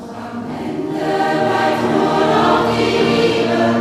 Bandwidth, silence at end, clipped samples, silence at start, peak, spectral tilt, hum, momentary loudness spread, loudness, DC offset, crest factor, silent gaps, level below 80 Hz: 15 kHz; 0 s; under 0.1%; 0 s; -2 dBFS; -5.5 dB/octave; none; 11 LU; -16 LUFS; under 0.1%; 14 dB; none; -46 dBFS